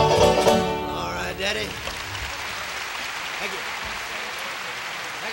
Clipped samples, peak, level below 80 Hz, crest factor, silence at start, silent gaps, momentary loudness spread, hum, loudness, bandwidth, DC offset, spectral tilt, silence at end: under 0.1%; -4 dBFS; -44 dBFS; 20 dB; 0 s; none; 11 LU; none; -25 LUFS; 16.5 kHz; under 0.1%; -3.5 dB/octave; 0 s